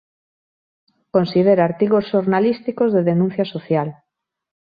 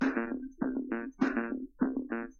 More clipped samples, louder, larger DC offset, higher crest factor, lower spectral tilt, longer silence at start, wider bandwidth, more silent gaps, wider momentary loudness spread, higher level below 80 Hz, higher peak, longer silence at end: neither; first, -18 LUFS vs -34 LUFS; neither; about the same, 16 dB vs 18 dB; first, -10.5 dB/octave vs -5.5 dB/octave; first, 1.15 s vs 0 s; second, 5 kHz vs 6.8 kHz; neither; about the same, 6 LU vs 6 LU; about the same, -62 dBFS vs -60 dBFS; first, -4 dBFS vs -14 dBFS; first, 0.75 s vs 0.05 s